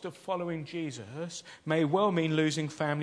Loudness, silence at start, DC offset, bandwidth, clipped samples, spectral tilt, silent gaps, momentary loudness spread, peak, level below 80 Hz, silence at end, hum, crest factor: -31 LUFS; 0 s; under 0.1%; 11 kHz; under 0.1%; -5.5 dB/octave; none; 13 LU; -14 dBFS; -78 dBFS; 0 s; none; 18 dB